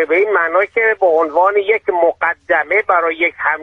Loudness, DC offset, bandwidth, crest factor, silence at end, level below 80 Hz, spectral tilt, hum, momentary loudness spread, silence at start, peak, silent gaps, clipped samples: -14 LUFS; under 0.1%; 5.8 kHz; 14 dB; 0 s; -58 dBFS; -5 dB/octave; none; 3 LU; 0 s; 0 dBFS; none; under 0.1%